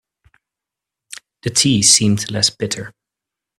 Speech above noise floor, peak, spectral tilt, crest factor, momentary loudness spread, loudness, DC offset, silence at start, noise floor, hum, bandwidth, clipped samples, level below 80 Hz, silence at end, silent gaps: 69 dB; 0 dBFS; -2.5 dB/octave; 20 dB; 26 LU; -14 LUFS; under 0.1%; 1.45 s; -85 dBFS; none; 15.5 kHz; under 0.1%; -54 dBFS; 0.7 s; none